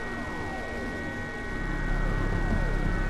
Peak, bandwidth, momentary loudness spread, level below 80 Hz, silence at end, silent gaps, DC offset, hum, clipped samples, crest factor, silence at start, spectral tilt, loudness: -16 dBFS; 10.5 kHz; 5 LU; -32 dBFS; 0 s; none; under 0.1%; none; under 0.1%; 12 dB; 0 s; -6.5 dB/octave; -32 LUFS